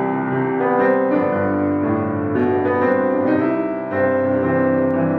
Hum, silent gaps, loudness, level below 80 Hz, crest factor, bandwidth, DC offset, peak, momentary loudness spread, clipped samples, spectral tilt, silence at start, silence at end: none; none; -18 LUFS; -62 dBFS; 12 dB; 4.6 kHz; under 0.1%; -4 dBFS; 4 LU; under 0.1%; -10.5 dB/octave; 0 s; 0 s